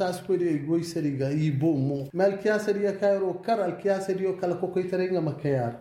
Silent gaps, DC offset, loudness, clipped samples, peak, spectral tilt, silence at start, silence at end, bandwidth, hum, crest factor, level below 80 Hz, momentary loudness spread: none; under 0.1%; -27 LUFS; under 0.1%; -12 dBFS; -7.5 dB/octave; 0 s; 0 s; 15.5 kHz; none; 14 dB; -66 dBFS; 3 LU